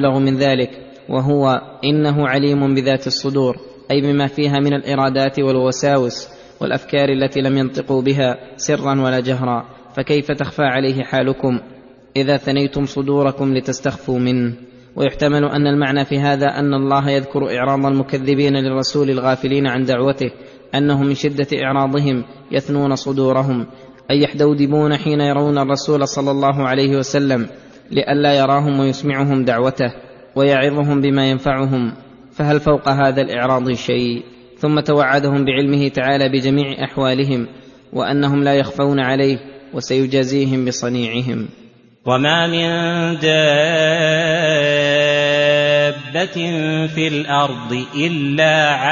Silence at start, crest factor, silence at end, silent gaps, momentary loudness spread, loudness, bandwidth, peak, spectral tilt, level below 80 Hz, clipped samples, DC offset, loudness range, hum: 0 s; 16 dB; 0 s; none; 8 LU; -17 LUFS; 7.4 kHz; -2 dBFS; -6 dB/octave; -50 dBFS; under 0.1%; under 0.1%; 3 LU; none